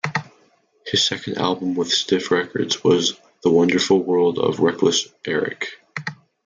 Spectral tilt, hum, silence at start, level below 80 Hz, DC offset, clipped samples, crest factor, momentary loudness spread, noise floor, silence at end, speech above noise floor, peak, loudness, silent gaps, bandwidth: -4 dB/octave; none; 0.05 s; -64 dBFS; under 0.1%; under 0.1%; 18 dB; 12 LU; -59 dBFS; 0.3 s; 39 dB; -4 dBFS; -20 LUFS; none; 9.6 kHz